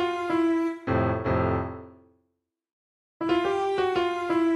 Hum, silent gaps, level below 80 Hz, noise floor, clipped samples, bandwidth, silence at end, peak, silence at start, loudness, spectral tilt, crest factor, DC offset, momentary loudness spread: none; 2.73-3.20 s; -50 dBFS; -79 dBFS; under 0.1%; 10.5 kHz; 0 s; -12 dBFS; 0 s; -26 LUFS; -7.5 dB/octave; 14 dB; under 0.1%; 6 LU